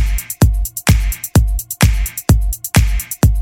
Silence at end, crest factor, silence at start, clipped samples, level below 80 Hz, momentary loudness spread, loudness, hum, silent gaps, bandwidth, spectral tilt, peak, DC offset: 0 s; 14 dB; 0 s; under 0.1%; -16 dBFS; 4 LU; -16 LUFS; none; none; 18.5 kHz; -5 dB/octave; 0 dBFS; under 0.1%